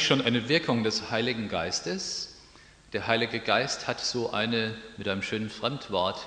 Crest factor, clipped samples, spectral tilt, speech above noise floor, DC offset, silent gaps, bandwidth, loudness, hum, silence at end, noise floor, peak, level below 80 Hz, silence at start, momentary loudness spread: 22 dB; under 0.1%; -3.5 dB/octave; 25 dB; under 0.1%; none; 10 kHz; -28 LUFS; none; 0 s; -54 dBFS; -6 dBFS; -60 dBFS; 0 s; 9 LU